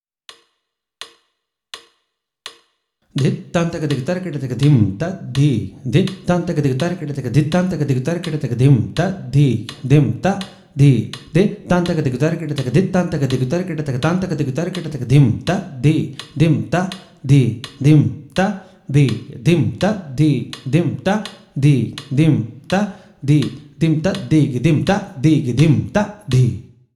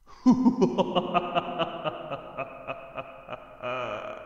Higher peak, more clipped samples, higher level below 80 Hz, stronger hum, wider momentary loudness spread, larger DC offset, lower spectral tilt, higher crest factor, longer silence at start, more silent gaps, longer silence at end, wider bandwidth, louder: first, 0 dBFS vs -8 dBFS; neither; first, -46 dBFS vs -58 dBFS; neither; second, 11 LU vs 18 LU; neither; about the same, -7.5 dB/octave vs -6.5 dB/octave; about the same, 16 dB vs 20 dB; first, 1 s vs 0.05 s; neither; first, 0.35 s vs 0 s; first, 12 kHz vs 7.4 kHz; first, -18 LUFS vs -28 LUFS